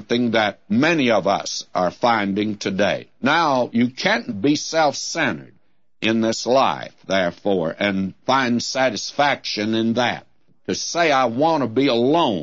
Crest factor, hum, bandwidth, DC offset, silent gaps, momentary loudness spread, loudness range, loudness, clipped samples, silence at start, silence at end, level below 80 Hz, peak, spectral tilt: 16 dB; none; 8 kHz; 0.2%; none; 6 LU; 1 LU; -20 LUFS; under 0.1%; 0 s; 0 s; -62 dBFS; -4 dBFS; -4 dB/octave